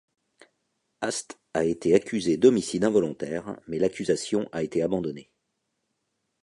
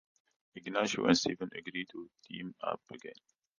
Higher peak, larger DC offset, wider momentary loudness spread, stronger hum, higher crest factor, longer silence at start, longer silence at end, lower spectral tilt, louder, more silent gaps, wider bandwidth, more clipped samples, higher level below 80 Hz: first, -6 dBFS vs -12 dBFS; neither; second, 13 LU vs 20 LU; neither; about the same, 22 dB vs 26 dB; first, 1 s vs 0.55 s; first, 1.2 s vs 0.45 s; about the same, -5 dB/octave vs -4 dB/octave; first, -26 LUFS vs -35 LUFS; neither; first, 11.5 kHz vs 10 kHz; neither; first, -60 dBFS vs -72 dBFS